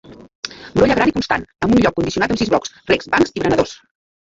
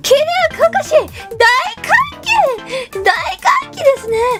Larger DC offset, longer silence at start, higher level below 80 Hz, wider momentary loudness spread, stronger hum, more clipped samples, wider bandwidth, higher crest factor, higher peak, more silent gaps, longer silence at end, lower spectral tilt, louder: neither; about the same, 0.1 s vs 0.05 s; about the same, -42 dBFS vs -44 dBFS; first, 9 LU vs 5 LU; neither; neither; second, 7.8 kHz vs 16.5 kHz; about the same, 16 dB vs 14 dB; about the same, 0 dBFS vs 0 dBFS; first, 0.35-0.43 s vs none; first, 0.6 s vs 0 s; first, -5.5 dB/octave vs -2 dB/octave; second, -17 LUFS vs -13 LUFS